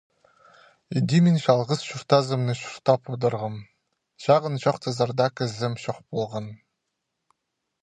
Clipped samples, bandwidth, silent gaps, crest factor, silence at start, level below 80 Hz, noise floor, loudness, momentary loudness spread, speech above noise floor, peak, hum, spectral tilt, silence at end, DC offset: under 0.1%; 9.8 kHz; none; 22 dB; 0.9 s; -66 dBFS; -80 dBFS; -24 LUFS; 12 LU; 57 dB; -2 dBFS; none; -6.5 dB/octave; 1.3 s; under 0.1%